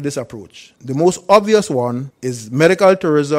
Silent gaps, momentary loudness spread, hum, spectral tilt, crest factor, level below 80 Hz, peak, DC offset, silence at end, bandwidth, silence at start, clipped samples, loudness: none; 16 LU; none; -5.5 dB/octave; 16 dB; -56 dBFS; 0 dBFS; under 0.1%; 0 s; 16 kHz; 0 s; 0.1%; -15 LUFS